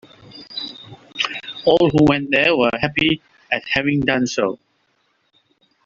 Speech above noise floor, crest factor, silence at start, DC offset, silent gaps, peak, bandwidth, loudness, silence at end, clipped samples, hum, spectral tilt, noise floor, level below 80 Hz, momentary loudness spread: 48 dB; 20 dB; 0.35 s; under 0.1%; none; 0 dBFS; 7.6 kHz; -18 LUFS; 1.3 s; under 0.1%; none; -5.5 dB/octave; -65 dBFS; -50 dBFS; 16 LU